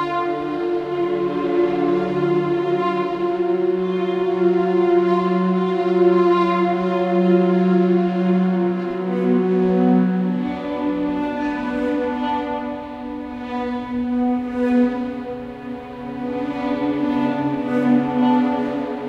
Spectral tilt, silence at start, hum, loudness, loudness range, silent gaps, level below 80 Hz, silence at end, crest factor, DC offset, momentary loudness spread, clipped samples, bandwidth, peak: -9 dB/octave; 0 s; none; -20 LUFS; 6 LU; none; -52 dBFS; 0 s; 14 dB; under 0.1%; 10 LU; under 0.1%; 6.4 kHz; -4 dBFS